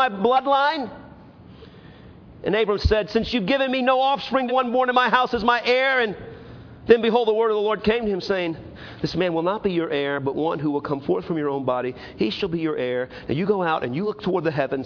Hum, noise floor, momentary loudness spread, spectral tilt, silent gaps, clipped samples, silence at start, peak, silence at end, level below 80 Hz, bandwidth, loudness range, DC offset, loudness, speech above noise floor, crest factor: none; -45 dBFS; 10 LU; -6.5 dB/octave; none; under 0.1%; 0 s; -2 dBFS; 0 s; -44 dBFS; 5.4 kHz; 5 LU; under 0.1%; -22 LUFS; 23 dB; 20 dB